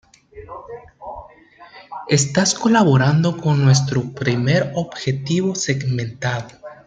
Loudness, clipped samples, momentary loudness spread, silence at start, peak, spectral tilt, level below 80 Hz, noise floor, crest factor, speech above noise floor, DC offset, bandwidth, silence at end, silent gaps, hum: -18 LUFS; under 0.1%; 21 LU; 0.35 s; -2 dBFS; -5 dB/octave; -54 dBFS; -45 dBFS; 16 dB; 27 dB; under 0.1%; 9.4 kHz; 0.1 s; none; none